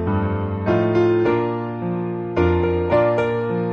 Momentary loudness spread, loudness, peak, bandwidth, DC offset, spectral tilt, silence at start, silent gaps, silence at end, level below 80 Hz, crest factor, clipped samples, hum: 7 LU; -20 LUFS; -6 dBFS; 6.4 kHz; under 0.1%; -9.5 dB/octave; 0 s; none; 0 s; -40 dBFS; 14 dB; under 0.1%; none